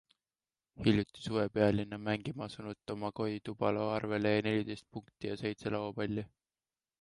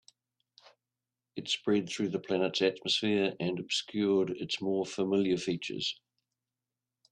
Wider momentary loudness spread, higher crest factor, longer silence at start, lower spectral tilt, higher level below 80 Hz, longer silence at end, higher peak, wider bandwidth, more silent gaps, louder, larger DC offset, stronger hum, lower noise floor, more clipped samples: first, 12 LU vs 7 LU; about the same, 20 dB vs 20 dB; second, 0.8 s vs 1.35 s; first, -7 dB/octave vs -4.5 dB/octave; first, -62 dBFS vs -74 dBFS; second, 0.75 s vs 1.2 s; about the same, -16 dBFS vs -14 dBFS; about the same, 11.5 kHz vs 10.5 kHz; neither; second, -35 LUFS vs -31 LUFS; neither; neither; about the same, under -90 dBFS vs -90 dBFS; neither